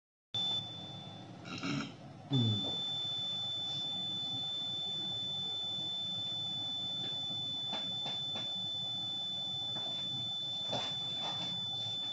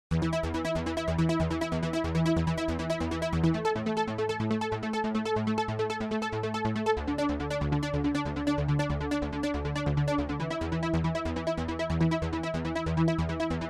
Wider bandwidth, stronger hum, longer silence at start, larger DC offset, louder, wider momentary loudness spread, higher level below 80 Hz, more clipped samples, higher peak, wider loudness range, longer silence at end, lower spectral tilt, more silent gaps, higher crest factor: second, 9.8 kHz vs 11.5 kHz; neither; first, 0.35 s vs 0.1 s; neither; second, -35 LUFS vs -30 LUFS; about the same, 5 LU vs 4 LU; second, -76 dBFS vs -42 dBFS; neither; second, -20 dBFS vs -14 dBFS; about the same, 1 LU vs 1 LU; about the same, 0 s vs 0 s; second, -4 dB/octave vs -7 dB/octave; neither; about the same, 18 dB vs 14 dB